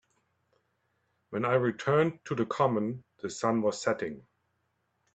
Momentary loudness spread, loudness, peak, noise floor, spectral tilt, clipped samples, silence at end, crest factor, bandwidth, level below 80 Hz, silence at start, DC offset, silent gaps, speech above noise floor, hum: 12 LU; -30 LUFS; -10 dBFS; -77 dBFS; -6 dB/octave; under 0.1%; 0.95 s; 20 dB; 9 kHz; -70 dBFS; 1.3 s; under 0.1%; none; 48 dB; none